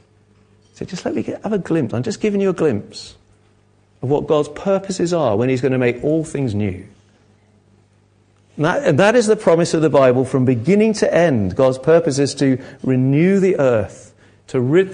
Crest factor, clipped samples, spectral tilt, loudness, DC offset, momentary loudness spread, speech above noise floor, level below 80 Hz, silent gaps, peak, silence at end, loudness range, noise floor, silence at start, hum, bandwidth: 16 dB; under 0.1%; -6.5 dB/octave; -17 LUFS; under 0.1%; 10 LU; 39 dB; -48 dBFS; none; 0 dBFS; 0 s; 7 LU; -55 dBFS; 0.8 s; 50 Hz at -45 dBFS; 10 kHz